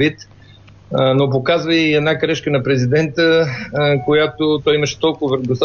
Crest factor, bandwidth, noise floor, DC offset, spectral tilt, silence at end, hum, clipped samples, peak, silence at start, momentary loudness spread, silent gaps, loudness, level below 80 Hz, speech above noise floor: 12 dB; 7 kHz; -43 dBFS; under 0.1%; -6 dB/octave; 0 s; none; under 0.1%; -4 dBFS; 0 s; 4 LU; none; -16 LUFS; -50 dBFS; 27 dB